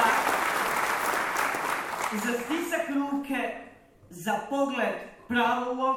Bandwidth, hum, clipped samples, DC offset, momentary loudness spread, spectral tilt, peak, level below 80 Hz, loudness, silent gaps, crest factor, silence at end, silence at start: 17.5 kHz; none; under 0.1%; under 0.1%; 6 LU; -3 dB/octave; -8 dBFS; -62 dBFS; -28 LUFS; none; 20 dB; 0 s; 0 s